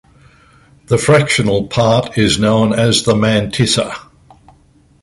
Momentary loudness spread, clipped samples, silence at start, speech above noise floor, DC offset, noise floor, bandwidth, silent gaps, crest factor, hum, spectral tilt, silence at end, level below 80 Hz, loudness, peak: 5 LU; under 0.1%; 0.9 s; 37 dB; under 0.1%; -50 dBFS; 11.5 kHz; none; 14 dB; none; -5 dB/octave; 1.05 s; -40 dBFS; -13 LUFS; 0 dBFS